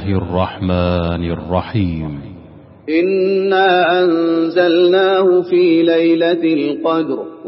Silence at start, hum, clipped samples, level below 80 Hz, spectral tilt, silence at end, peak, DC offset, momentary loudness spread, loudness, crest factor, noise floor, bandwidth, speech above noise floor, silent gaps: 0 s; none; under 0.1%; -40 dBFS; -5 dB/octave; 0 s; -2 dBFS; under 0.1%; 8 LU; -15 LUFS; 14 dB; -39 dBFS; 5.8 kHz; 25 dB; none